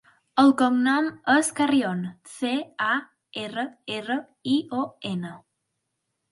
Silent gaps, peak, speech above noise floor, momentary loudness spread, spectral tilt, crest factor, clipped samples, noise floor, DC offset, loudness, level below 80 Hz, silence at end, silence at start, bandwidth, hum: none; -6 dBFS; 55 dB; 13 LU; -4 dB/octave; 20 dB; under 0.1%; -79 dBFS; under 0.1%; -24 LUFS; -72 dBFS; 0.95 s; 0.35 s; 11.5 kHz; none